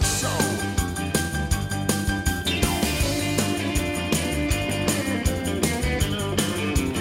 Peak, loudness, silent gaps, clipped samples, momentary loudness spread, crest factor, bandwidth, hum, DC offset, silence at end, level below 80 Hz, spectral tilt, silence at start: -8 dBFS; -24 LUFS; none; under 0.1%; 3 LU; 16 dB; 16.5 kHz; none; under 0.1%; 0 s; -32 dBFS; -4 dB/octave; 0 s